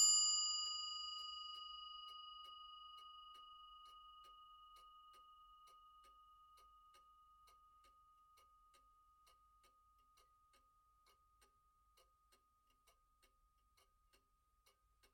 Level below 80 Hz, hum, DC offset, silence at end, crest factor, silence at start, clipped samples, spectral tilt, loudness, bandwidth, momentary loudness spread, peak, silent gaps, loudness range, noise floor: -82 dBFS; none; under 0.1%; 8.9 s; 26 dB; 0 s; under 0.1%; 4 dB/octave; -41 LUFS; 16.5 kHz; 27 LU; -24 dBFS; none; 23 LU; -80 dBFS